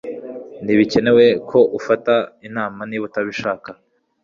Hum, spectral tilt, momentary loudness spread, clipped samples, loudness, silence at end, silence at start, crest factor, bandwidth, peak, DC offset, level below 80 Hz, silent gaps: none; -6 dB/octave; 17 LU; under 0.1%; -17 LUFS; 0.5 s; 0.05 s; 16 dB; 7.4 kHz; -2 dBFS; under 0.1%; -56 dBFS; none